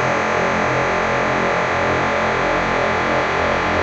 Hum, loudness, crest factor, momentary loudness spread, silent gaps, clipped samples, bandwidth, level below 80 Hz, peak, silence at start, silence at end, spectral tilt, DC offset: none; -18 LUFS; 12 dB; 0 LU; none; under 0.1%; 8.4 kHz; -40 dBFS; -6 dBFS; 0 s; 0 s; -5 dB/octave; under 0.1%